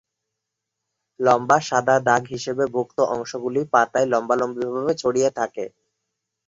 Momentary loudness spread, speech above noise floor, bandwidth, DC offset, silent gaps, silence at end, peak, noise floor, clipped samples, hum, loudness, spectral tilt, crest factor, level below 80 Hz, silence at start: 9 LU; 61 dB; 7.8 kHz; under 0.1%; none; 0.8 s; -2 dBFS; -82 dBFS; under 0.1%; none; -21 LUFS; -4.5 dB/octave; 20 dB; -64 dBFS; 1.2 s